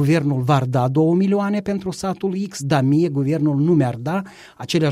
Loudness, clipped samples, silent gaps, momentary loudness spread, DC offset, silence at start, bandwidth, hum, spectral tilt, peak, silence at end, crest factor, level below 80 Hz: -19 LUFS; under 0.1%; none; 8 LU; under 0.1%; 0 s; 14.5 kHz; none; -7 dB/octave; -4 dBFS; 0 s; 16 dB; -54 dBFS